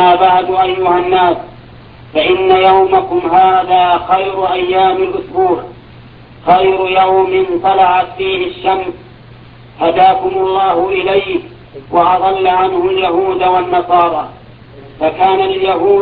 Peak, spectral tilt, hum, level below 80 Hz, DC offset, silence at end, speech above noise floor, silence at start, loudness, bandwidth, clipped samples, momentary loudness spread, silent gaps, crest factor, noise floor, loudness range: 0 dBFS; -8.5 dB/octave; none; -44 dBFS; under 0.1%; 0 s; 25 dB; 0 s; -12 LUFS; 4.9 kHz; under 0.1%; 9 LU; none; 12 dB; -36 dBFS; 3 LU